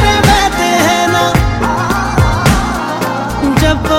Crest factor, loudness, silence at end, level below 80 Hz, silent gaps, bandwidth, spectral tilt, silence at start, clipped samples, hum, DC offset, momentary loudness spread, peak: 12 dB; -12 LUFS; 0 s; -20 dBFS; none; 17 kHz; -4.5 dB/octave; 0 s; under 0.1%; none; under 0.1%; 7 LU; 0 dBFS